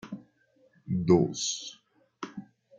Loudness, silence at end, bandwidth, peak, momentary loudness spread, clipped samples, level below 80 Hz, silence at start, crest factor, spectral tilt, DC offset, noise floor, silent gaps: -27 LUFS; 0.4 s; 9.4 kHz; -10 dBFS; 21 LU; under 0.1%; -64 dBFS; 0.05 s; 22 dB; -5.5 dB/octave; under 0.1%; -66 dBFS; none